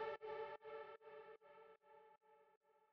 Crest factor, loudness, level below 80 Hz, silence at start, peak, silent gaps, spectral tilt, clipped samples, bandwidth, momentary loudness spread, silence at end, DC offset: 20 dB; -54 LUFS; under -90 dBFS; 0 s; -36 dBFS; 2.57-2.61 s; -1.5 dB/octave; under 0.1%; 6.2 kHz; 17 LU; 0.05 s; under 0.1%